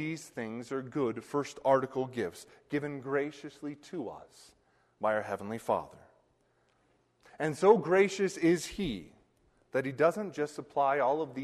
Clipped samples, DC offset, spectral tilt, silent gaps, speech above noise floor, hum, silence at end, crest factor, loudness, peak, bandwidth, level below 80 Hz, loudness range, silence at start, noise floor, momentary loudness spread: under 0.1%; under 0.1%; -5.5 dB/octave; none; 40 dB; none; 0 s; 22 dB; -32 LUFS; -10 dBFS; 13 kHz; -64 dBFS; 8 LU; 0 s; -71 dBFS; 14 LU